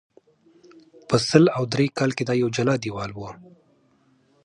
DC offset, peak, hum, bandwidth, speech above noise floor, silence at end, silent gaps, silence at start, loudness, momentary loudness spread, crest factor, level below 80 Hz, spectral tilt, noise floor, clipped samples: under 0.1%; 0 dBFS; none; 11.5 kHz; 40 dB; 1.1 s; none; 1.1 s; -22 LUFS; 15 LU; 24 dB; -58 dBFS; -6 dB/octave; -62 dBFS; under 0.1%